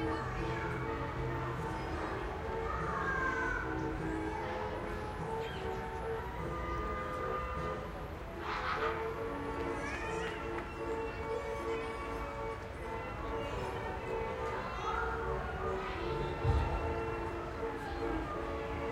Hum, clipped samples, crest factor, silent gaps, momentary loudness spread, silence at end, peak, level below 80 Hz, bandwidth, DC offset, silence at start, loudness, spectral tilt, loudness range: none; under 0.1%; 18 dB; none; 5 LU; 0 s; -18 dBFS; -46 dBFS; 16.5 kHz; under 0.1%; 0 s; -38 LUFS; -6.5 dB/octave; 3 LU